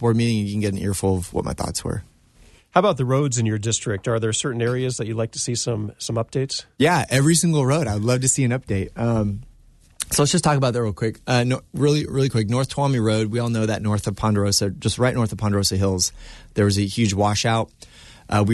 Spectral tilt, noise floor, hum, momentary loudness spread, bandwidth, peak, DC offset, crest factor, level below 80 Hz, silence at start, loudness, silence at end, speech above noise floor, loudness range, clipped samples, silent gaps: -5 dB/octave; -52 dBFS; none; 8 LU; 12.5 kHz; -2 dBFS; under 0.1%; 18 dB; -46 dBFS; 0 s; -21 LUFS; 0 s; 31 dB; 3 LU; under 0.1%; none